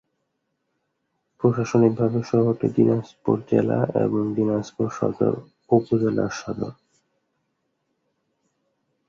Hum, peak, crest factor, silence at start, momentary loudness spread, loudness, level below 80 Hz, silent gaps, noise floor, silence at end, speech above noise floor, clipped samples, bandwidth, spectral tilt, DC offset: none; -4 dBFS; 20 dB; 1.4 s; 8 LU; -22 LUFS; -58 dBFS; none; -76 dBFS; 2.35 s; 54 dB; under 0.1%; 7.4 kHz; -8 dB/octave; under 0.1%